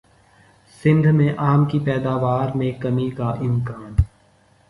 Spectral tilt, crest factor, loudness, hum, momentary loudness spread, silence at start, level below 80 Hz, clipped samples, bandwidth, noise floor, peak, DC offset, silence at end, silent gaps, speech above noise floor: -9.5 dB/octave; 16 dB; -20 LUFS; none; 7 LU; 0.85 s; -34 dBFS; under 0.1%; 11 kHz; -56 dBFS; -4 dBFS; under 0.1%; 0.65 s; none; 37 dB